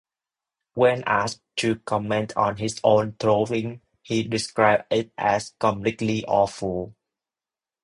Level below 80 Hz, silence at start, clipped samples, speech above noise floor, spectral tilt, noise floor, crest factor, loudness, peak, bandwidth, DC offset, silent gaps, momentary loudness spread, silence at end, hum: -56 dBFS; 0.75 s; under 0.1%; over 67 dB; -5 dB/octave; under -90 dBFS; 20 dB; -23 LUFS; -4 dBFS; 11 kHz; under 0.1%; none; 9 LU; 0.95 s; none